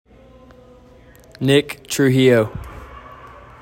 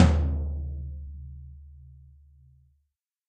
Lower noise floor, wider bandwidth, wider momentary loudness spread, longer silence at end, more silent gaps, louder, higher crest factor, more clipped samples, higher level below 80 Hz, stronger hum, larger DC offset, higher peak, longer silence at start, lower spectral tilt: second, -46 dBFS vs -78 dBFS; first, 16.5 kHz vs 8.4 kHz; about the same, 25 LU vs 24 LU; second, 0.35 s vs 1.4 s; neither; first, -17 LUFS vs -30 LUFS; second, 18 dB vs 24 dB; neither; second, -46 dBFS vs -32 dBFS; neither; neither; about the same, -2 dBFS vs -4 dBFS; first, 1.4 s vs 0 s; second, -5.5 dB/octave vs -7.5 dB/octave